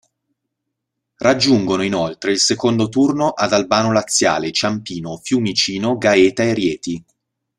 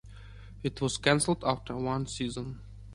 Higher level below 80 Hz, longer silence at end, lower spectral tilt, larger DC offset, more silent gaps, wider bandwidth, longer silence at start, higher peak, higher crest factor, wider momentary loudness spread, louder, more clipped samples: about the same, -54 dBFS vs -50 dBFS; first, 0.6 s vs 0 s; about the same, -4 dB/octave vs -4.5 dB/octave; neither; neither; first, 13 kHz vs 11.5 kHz; first, 1.2 s vs 0.05 s; first, 0 dBFS vs -8 dBFS; second, 16 dB vs 24 dB; second, 8 LU vs 22 LU; first, -17 LUFS vs -30 LUFS; neither